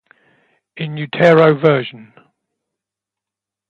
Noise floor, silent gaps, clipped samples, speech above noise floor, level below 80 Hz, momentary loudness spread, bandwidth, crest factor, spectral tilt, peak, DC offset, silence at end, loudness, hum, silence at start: -86 dBFS; none; under 0.1%; 72 dB; -62 dBFS; 17 LU; 7.4 kHz; 18 dB; -8 dB/octave; 0 dBFS; under 0.1%; 1.75 s; -13 LUFS; none; 0.75 s